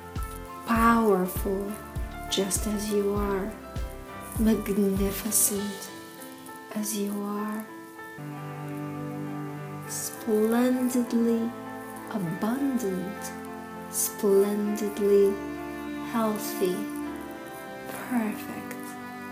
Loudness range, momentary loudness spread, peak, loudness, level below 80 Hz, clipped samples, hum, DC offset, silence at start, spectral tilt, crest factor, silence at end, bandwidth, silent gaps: 8 LU; 16 LU; -8 dBFS; -28 LUFS; -44 dBFS; under 0.1%; none; under 0.1%; 0 s; -4.5 dB/octave; 20 dB; 0 s; 16 kHz; none